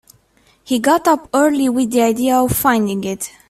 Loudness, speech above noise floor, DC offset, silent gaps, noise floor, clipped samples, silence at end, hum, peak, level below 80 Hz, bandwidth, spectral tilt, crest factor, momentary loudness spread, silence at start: -16 LUFS; 40 dB; under 0.1%; none; -55 dBFS; under 0.1%; 0.2 s; none; -2 dBFS; -46 dBFS; 16 kHz; -4.5 dB/octave; 16 dB; 7 LU; 0.65 s